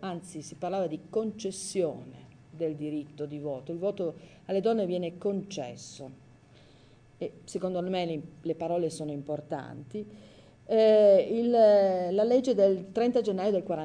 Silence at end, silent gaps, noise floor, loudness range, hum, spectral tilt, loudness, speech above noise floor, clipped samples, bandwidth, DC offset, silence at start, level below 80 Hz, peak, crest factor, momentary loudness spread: 0 s; none; -57 dBFS; 11 LU; none; -6 dB/octave; -28 LUFS; 29 dB; under 0.1%; 10 kHz; under 0.1%; 0 s; -70 dBFS; -12 dBFS; 18 dB; 19 LU